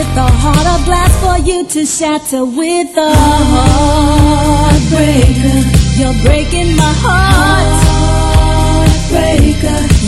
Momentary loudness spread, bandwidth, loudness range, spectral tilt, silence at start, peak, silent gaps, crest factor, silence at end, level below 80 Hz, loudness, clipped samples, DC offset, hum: 5 LU; 13.5 kHz; 2 LU; -5 dB/octave; 0 s; 0 dBFS; none; 8 dB; 0 s; -14 dBFS; -10 LUFS; 0.6%; under 0.1%; none